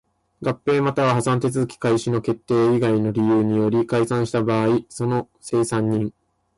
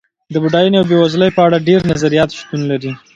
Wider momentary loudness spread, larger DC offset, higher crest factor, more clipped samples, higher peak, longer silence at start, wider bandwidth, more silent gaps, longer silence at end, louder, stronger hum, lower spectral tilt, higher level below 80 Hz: about the same, 6 LU vs 8 LU; neither; about the same, 12 dB vs 14 dB; neither; second, -8 dBFS vs 0 dBFS; about the same, 0.4 s vs 0.3 s; first, 11.5 kHz vs 8.8 kHz; neither; first, 0.45 s vs 0.2 s; second, -21 LUFS vs -13 LUFS; neither; about the same, -7 dB/octave vs -6.5 dB/octave; second, -56 dBFS vs -44 dBFS